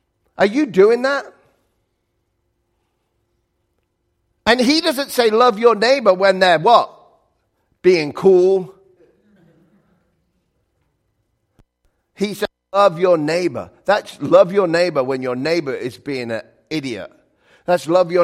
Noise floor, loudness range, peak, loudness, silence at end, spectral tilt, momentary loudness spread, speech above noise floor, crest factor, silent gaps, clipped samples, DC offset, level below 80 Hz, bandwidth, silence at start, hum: -70 dBFS; 9 LU; 0 dBFS; -16 LUFS; 0 s; -5 dB/octave; 13 LU; 54 dB; 18 dB; none; under 0.1%; under 0.1%; -58 dBFS; 15.5 kHz; 0.4 s; none